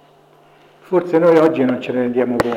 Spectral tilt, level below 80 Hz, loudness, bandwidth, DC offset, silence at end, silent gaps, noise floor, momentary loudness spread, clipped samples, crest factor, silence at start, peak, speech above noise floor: -7.5 dB/octave; -56 dBFS; -16 LUFS; 14.5 kHz; under 0.1%; 0 s; none; -49 dBFS; 8 LU; under 0.1%; 14 dB; 0.9 s; -4 dBFS; 34 dB